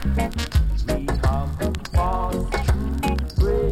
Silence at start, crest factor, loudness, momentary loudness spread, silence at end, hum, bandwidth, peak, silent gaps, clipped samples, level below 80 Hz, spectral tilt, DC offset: 0 s; 14 dB; -23 LUFS; 3 LU; 0 s; none; 15.5 kHz; -8 dBFS; none; under 0.1%; -24 dBFS; -6.5 dB/octave; under 0.1%